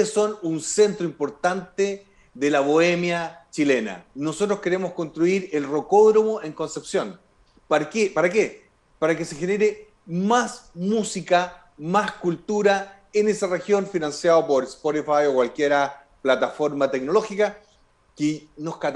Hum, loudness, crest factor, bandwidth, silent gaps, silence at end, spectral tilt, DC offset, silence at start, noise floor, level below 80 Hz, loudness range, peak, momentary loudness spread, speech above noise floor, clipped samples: none; -23 LUFS; 16 dB; 11.5 kHz; none; 0 s; -5 dB/octave; under 0.1%; 0 s; -59 dBFS; -62 dBFS; 2 LU; -6 dBFS; 9 LU; 37 dB; under 0.1%